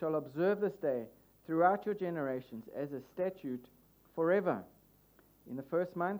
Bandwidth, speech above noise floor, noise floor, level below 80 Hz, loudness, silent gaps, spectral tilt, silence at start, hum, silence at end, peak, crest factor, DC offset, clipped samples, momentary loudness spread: over 20 kHz; 30 dB; -65 dBFS; -76 dBFS; -35 LUFS; none; -8.5 dB/octave; 0 s; 50 Hz at -70 dBFS; 0 s; -16 dBFS; 20 dB; under 0.1%; under 0.1%; 15 LU